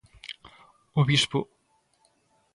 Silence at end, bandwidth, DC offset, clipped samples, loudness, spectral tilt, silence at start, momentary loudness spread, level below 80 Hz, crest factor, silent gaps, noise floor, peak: 1.1 s; 11.5 kHz; under 0.1%; under 0.1%; -25 LUFS; -4.5 dB/octave; 0.25 s; 22 LU; -60 dBFS; 20 dB; none; -69 dBFS; -10 dBFS